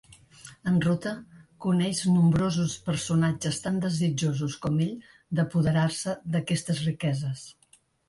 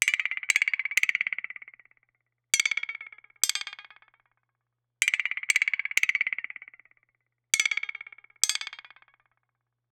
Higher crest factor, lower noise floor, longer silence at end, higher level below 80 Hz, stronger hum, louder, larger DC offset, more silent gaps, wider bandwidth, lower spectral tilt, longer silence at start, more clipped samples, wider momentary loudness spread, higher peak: second, 14 dB vs 28 dB; second, -51 dBFS vs -83 dBFS; second, 0.55 s vs 1.25 s; first, -56 dBFS vs -78 dBFS; neither; about the same, -27 LUFS vs -26 LUFS; neither; neither; second, 11.5 kHz vs over 20 kHz; first, -6 dB/octave vs 4.5 dB/octave; first, 0.45 s vs 0 s; neither; second, 11 LU vs 18 LU; second, -14 dBFS vs -4 dBFS